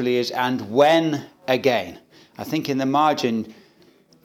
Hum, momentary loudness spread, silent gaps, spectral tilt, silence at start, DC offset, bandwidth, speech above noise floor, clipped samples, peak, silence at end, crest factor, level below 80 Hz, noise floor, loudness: none; 12 LU; none; -5.5 dB/octave; 0 s; under 0.1%; 17.5 kHz; 34 dB; under 0.1%; -2 dBFS; 0.75 s; 20 dB; -70 dBFS; -55 dBFS; -21 LUFS